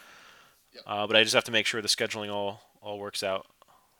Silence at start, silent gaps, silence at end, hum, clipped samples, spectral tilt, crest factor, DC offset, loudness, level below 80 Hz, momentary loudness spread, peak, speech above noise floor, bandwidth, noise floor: 0.1 s; none; 0.55 s; none; under 0.1%; -2 dB/octave; 26 dB; under 0.1%; -27 LUFS; -76 dBFS; 17 LU; -6 dBFS; 29 dB; 19.5 kHz; -57 dBFS